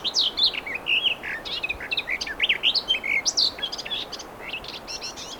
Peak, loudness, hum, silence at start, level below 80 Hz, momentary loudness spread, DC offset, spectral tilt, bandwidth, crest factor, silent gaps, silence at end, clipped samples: -8 dBFS; -23 LUFS; none; 0 s; -52 dBFS; 13 LU; under 0.1%; 0.5 dB/octave; over 20 kHz; 18 dB; none; 0 s; under 0.1%